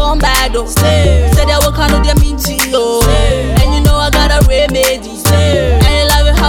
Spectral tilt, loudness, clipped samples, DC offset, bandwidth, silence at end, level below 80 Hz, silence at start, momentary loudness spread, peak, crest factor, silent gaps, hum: -4.5 dB/octave; -10 LUFS; under 0.1%; under 0.1%; 20 kHz; 0 s; -12 dBFS; 0 s; 3 LU; 0 dBFS; 10 dB; none; none